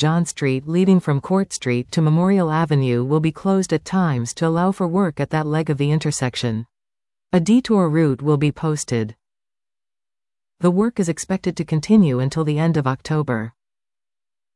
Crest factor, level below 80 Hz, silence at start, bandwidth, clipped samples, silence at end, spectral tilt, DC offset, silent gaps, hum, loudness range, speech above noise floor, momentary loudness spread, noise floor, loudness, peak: 14 dB; -54 dBFS; 0 s; 12 kHz; under 0.1%; 1.05 s; -6.5 dB/octave; under 0.1%; none; none; 3 LU; over 72 dB; 7 LU; under -90 dBFS; -19 LUFS; -4 dBFS